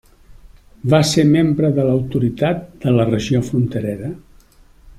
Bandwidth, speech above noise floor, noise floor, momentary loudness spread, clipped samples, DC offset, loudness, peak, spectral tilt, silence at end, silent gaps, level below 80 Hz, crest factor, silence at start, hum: 14 kHz; 32 dB; -48 dBFS; 12 LU; under 0.1%; under 0.1%; -17 LUFS; -2 dBFS; -6.5 dB/octave; 0.1 s; none; -44 dBFS; 16 dB; 0.3 s; none